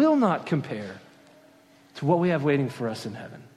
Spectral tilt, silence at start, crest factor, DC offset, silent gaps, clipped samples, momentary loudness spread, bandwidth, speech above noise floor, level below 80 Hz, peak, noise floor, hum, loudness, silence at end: -7.5 dB/octave; 0 s; 18 dB; under 0.1%; none; under 0.1%; 18 LU; 13 kHz; 30 dB; -70 dBFS; -8 dBFS; -56 dBFS; none; -26 LUFS; 0.15 s